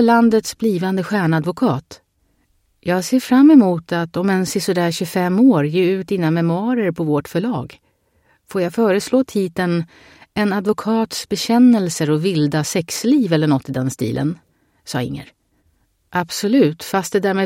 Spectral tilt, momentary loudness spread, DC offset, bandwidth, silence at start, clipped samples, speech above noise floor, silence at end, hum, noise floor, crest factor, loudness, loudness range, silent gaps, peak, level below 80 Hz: -6 dB/octave; 11 LU; under 0.1%; 16.5 kHz; 0 s; under 0.1%; 46 dB; 0 s; none; -63 dBFS; 16 dB; -17 LUFS; 6 LU; none; -2 dBFS; -56 dBFS